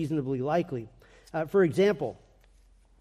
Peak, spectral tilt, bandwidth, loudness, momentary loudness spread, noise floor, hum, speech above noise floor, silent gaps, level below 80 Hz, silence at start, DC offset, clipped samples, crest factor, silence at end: -14 dBFS; -7.5 dB/octave; 13.5 kHz; -28 LUFS; 13 LU; -59 dBFS; none; 32 dB; none; -60 dBFS; 0 s; under 0.1%; under 0.1%; 16 dB; 0.85 s